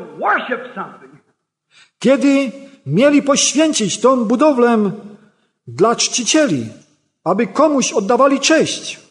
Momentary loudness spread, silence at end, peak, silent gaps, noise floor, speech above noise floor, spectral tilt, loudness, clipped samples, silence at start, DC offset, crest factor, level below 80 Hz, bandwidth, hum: 13 LU; 0.15 s; -2 dBFS; none; -65 dBFS; 51 dB; -3.5 dB/octave; -15 LUFS; under 0.1%; 0 s; under 0.1%; 14 dB; -66 dBFS; 11 kHz; none